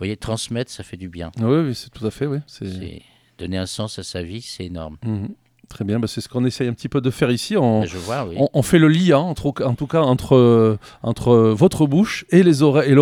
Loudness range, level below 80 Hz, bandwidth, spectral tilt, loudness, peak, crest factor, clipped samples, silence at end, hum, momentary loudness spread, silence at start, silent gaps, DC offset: 12 LU; -46 dBFS; 16.5 kHz; -6.5 dB/octave; -18 LUFS; 0 dBFS; 18 dB; under 0.1%; 0 s; none; 17 LU; 0 s; none; under 0.1%